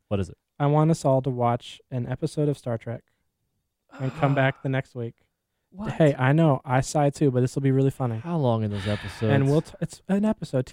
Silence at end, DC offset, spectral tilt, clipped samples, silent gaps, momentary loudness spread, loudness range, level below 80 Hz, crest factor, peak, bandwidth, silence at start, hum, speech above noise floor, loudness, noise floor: 0 s; under 0.1%; -7.5 dB/octave; under 0.1%; none; 13 LU; 6 LU; -54 dBFS; 18 dB; -6 dBFS; 11.5 kHz; 0.1 s; none; 53 dB; -24 LUFS; -77 dBFS